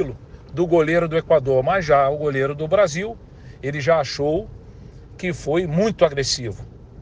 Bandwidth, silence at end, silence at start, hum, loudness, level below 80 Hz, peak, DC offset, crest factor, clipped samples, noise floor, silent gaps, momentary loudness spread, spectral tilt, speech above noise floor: 10 kHz; 0 s; 0 s; none; -20 LUFS; -44 dBFS; -4 dBFS; under 0.1%; 18 dB; under 0.1%; -41 dBFS; none; 15 LU; -5.5 dB/octave; 21 dB